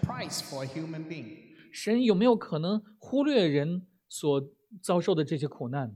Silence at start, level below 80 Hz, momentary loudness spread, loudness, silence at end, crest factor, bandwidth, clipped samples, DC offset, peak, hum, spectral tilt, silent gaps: 0 s; -66 dBFS; 16 LU; -29 LUFS; 0 s; 18 dB; 15.5 kHz; under 0.1%; under 0.1%; -10 dBFS; none; -6 dB/octave; none